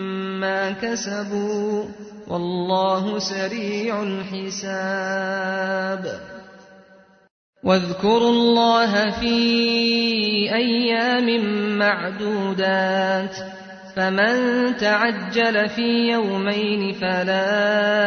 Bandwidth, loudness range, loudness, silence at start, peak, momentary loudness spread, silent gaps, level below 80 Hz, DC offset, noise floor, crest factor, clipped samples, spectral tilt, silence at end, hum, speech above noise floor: 6.6 kHz; 7 LU; -21 LUFS; 0 s; -4 dBFS; 10 LU; 7.31-7.53 s; -56 dBFS; under 0.1%; -51 dBFS; 16 dB; under 0.1%; -4.5 dB/octave; 0 s; none; 31 dB